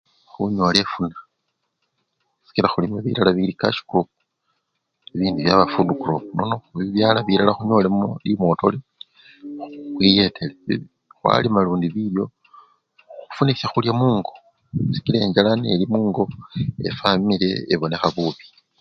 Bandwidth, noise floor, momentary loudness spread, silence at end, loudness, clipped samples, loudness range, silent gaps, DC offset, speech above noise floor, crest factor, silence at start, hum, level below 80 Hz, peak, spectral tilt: 10.5 kHz; -75 dBFS; 11 LU; 0.4 s; -20 LUFS; under 0.1%; 3 LU; none; under 0.1%; 55 dB; 22 dB; 0.4 s; none; -52 dBFS; 0 dBFS; -7 dB/octave